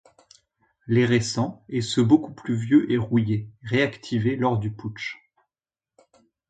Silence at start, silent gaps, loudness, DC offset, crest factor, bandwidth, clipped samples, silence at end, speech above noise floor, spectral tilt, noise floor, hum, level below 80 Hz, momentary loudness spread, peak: 0.85 s; none; -24 LUFS; under 0.1%; 20 dB; 9.2 kHz; under 0.1%; 1.35 s; over 67 dB; -6.5 dB/octave; under -90 dBFS; none; -56 dBFS; 12 LU; -6 dBFS